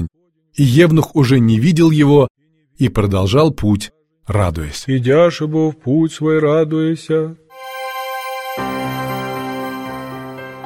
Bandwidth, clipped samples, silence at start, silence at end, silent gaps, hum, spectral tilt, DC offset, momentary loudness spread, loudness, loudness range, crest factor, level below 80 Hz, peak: 17 kHz; under 0.1%; 0 s; 0 s; 2.30-2.35 s; none; -7 dB/octave; under 0.1%; 16 LU; -15 LUFS; 9 LU; 16 dB; -38 dBFS; 0 dBFS